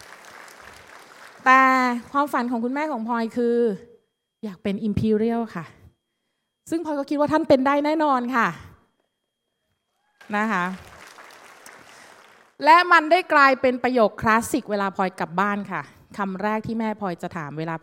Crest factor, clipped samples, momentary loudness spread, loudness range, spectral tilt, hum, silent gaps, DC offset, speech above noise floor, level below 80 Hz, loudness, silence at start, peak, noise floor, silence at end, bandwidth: 22 dB; under 0.1%; 16 LU; 9 LU; -5.5 dB/octave; none; none; under 0.1%; 56 dB; -60 dBFS; -21 LUFS; 0.1 s; -2 dBFS; -78 dBFS; 0.05 s; 16.5 kHz